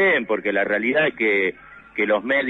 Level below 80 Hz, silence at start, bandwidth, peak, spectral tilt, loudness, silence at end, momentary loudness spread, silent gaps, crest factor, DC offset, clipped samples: -60 dBFS; 0 s; 6.2 kHz; -8 dBFS; -6.5 dB/octave; -20 LUFS; 0 s; 6 LU; none; 12 dB; under 0.1%; under 0.1%